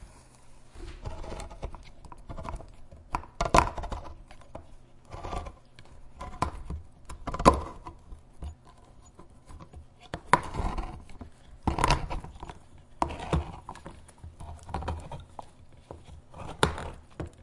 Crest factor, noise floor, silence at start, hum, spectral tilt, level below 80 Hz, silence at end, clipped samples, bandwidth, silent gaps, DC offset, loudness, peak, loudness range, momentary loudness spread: 32 dB; -53 dBFS; 0 s; none; -5 dB/octave; -40 dBFS; 0 s; under 0.1%; 11.5 kHz; none; under 0.1%; -32 LUFS; -2 dBFS; 9 LU; 25 LU